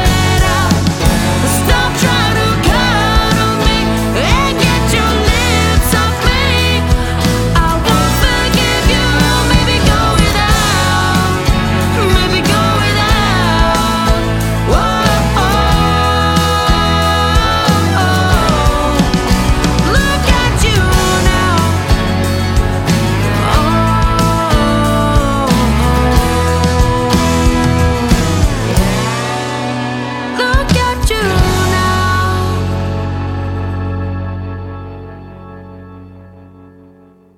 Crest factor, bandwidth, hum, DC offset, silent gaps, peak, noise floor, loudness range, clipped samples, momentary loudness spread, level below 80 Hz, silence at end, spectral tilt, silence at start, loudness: 12 dB; 17 kHz; none; under 0.1%; none; 0 dBFS; -43 dBFS; 3 LU; under 0.1%; 6 LU; -18 dBFS; 0.95 s; -5 dB/octave; 0 s; -12 LUFS